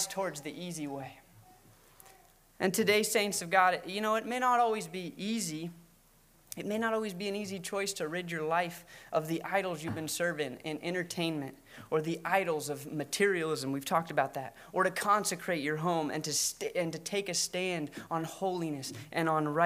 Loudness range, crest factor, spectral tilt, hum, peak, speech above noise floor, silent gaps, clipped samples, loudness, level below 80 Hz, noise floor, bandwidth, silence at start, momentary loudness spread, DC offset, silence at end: 5 LU; 22 dB; -3.5 dB/octave; none; -10 dBFS; 31 dB; none; under 0.1%; -32 LUFS; -70 dBFS; -63 dBFS; 16 kHz; 0 s; 11 LU; under 0.1%; 0 s